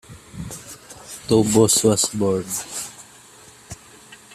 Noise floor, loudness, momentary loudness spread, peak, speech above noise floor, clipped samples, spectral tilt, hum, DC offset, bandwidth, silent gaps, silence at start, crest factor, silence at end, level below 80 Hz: -47 dBFS; -19 LUFS; 25 LU; -2 dBFS; 29 dB; under 0.1%; -4 dB/octave; none; under 0.1%; 15.5 kHz; none; 0.1 s; 20 dB; 0.2 s; -52 dBFS